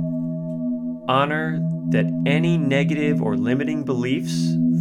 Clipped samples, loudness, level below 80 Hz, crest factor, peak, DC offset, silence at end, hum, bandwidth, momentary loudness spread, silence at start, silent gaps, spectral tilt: under 0.1%; -22 LUFS; -66 dBFS; 14 dB; -6 dBFS; under 0.1%; 0 s; none; 11 kHz; 7 LU; 0 s; none; -7 dB/octave